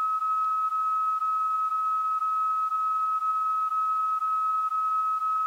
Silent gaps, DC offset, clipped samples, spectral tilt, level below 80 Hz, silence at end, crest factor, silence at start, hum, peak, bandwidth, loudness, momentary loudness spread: none; under 0.1%; under 0.1%; 6.5 dB/octave; under -90 dBFS; 0 s; 6 dB; 0 s; none; -20 dBFS; 16 kHz; -26 LUFS; 0 LU